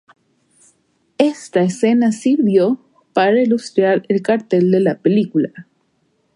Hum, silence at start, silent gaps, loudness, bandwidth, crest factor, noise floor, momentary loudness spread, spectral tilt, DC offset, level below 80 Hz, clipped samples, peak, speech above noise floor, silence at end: none; 1.2 s; none; -16 LUFS; 11.5 kHz; 16 dB; -63 dBFS; 5 LU; -6.5 dB/octave; under 0.1%; -66 dBFS; under 0.1%; -2 dBFS; 48 dB; 0.75 s